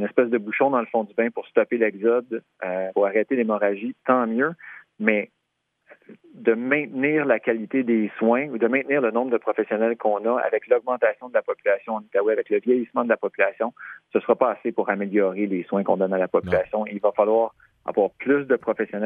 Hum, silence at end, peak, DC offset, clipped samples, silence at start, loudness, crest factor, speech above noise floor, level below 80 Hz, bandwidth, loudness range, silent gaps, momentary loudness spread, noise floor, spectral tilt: none; 0 s; -2 dBFS; under 0.1%; under 0.1%; 0 s; -23 LUFS; 20 dB; 53 dB; -66 dBFS; 3.7 kHz; 2 LU; none; 6 LU; -76 dBFS; -9.5 dB/octave